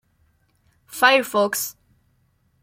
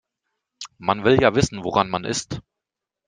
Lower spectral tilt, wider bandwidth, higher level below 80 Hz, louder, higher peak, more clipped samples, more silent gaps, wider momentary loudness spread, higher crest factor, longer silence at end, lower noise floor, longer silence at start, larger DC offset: second, -1.5 dB/octave vs -5 dB/octave; first, 16.5 kHz vs 10 kHz; second, -68 dBFS vs -50 dBFS; about the same, -19 LUFS vs -21 LUFS; about the same, -2 dBFS vs -2 dBFS; neither; neither; second, 14 LU vs 19 LU; about the same, 22 dB vs 22 dB; first, 0.9 s vs 0.7 s; second, -64 dBFS vs -86 dBFS; first, 0.9 s vs 0.6 s; neither